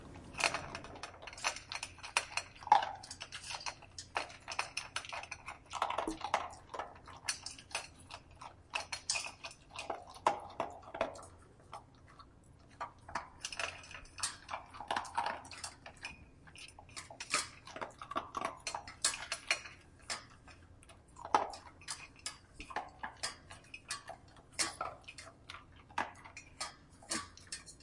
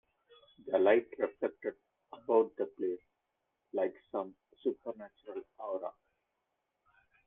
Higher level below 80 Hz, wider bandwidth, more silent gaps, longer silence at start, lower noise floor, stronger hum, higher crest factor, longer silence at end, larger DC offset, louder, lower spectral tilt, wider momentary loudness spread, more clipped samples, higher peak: first, -66 dBFS vs -82 dBFS; first, 11.5 kHz vs 3.9 kHz; neither; second, 0 s vs 0.65 s; second, -61 dBFS vs -84 dBFS; neither; first, 30 dB vs 24 dB; second, 0 s vs 1.35 s; neither; second, -40 LUFS vs -35 LUFS; second, -1 dB/octave vs -8 dB/octave; about the same, 18 LU vs 17 LU; neither; about the same, -12 dBFS vs -14 dBFS